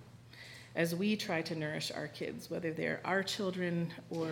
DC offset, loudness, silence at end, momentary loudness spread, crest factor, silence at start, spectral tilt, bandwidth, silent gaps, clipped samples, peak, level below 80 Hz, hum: under 0.1%; -36 LUFS; 0 s; 10 LU; 18 dB; 0 s; -5 dB/octave; 18 kHz; none; under 0.1%; -18 dBFS; -74 dBFS; none